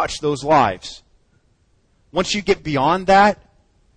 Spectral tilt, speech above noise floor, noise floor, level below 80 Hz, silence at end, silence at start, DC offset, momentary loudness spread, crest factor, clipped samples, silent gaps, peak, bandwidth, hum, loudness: -4.5 dB/octave; 43 dB; -60 dBFS; -44 dBFS; 0.65 s; 0 s; under 0.1%; 16 LU; 18 dB; under 0.1%; none; -2 dBFS; 10 kHz; none; -17 LUFS